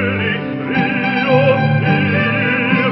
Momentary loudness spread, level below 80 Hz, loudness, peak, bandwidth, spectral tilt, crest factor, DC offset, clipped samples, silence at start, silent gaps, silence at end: 6 LU; -44 dBFS; -15 LUFS; 0 dBFS; 5.8 kHz; -12 dB/octave; 14 dB; under 0.1%; under 0.1%; 0 s; none; 0 s